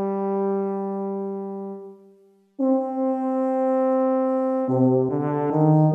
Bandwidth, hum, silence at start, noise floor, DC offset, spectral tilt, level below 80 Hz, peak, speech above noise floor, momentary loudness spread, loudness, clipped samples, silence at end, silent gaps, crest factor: 3 kHz; none; 0 s; -55 dBFS; under 0.1%; -12 dB/octave; -74 dBFS; -8 dBFS; 36 dB; 10 LU; -23 LUFS; under 0.1%; 0 s; none; 16 dB